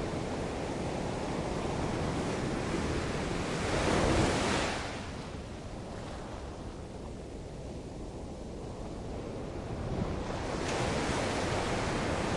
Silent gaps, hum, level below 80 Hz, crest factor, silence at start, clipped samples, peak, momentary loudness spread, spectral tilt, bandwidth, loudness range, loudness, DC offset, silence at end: none; none; -44 dBFS; 20 dB; 0 s; under 0.1%; -14 dBFS; 13 LU; -5 dB/octave; 11.5 kHz; 11 LU; -35 LUFS; under 0.1%; 0 s